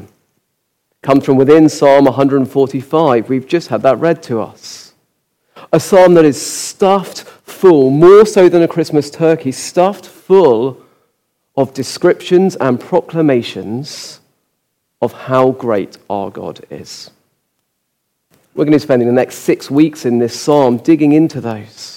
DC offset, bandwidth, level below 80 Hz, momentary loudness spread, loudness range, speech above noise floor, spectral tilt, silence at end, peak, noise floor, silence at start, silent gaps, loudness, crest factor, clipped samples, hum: under 0.1%; 16.5 kHz; -54 dBFS; 18 LU; 9 LU; 58 dB; -6 dB/octave; 0 s; 0 dBFS; -69 dBFS; 1.05 s; none; -12 LUFS; 12 dB; under 0.1%; none